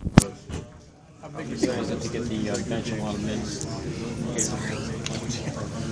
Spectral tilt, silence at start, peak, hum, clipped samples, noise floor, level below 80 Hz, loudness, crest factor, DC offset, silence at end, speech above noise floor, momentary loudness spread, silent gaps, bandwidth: -5 dB/octave; 0 s; 0 dBFS; none; under 0.1%; -48 dBFS; -42 dBFS; -29 LUFS; 28 dB; under 0.1%; 0 s; 19 dB; 11 LU; none; 11 kHz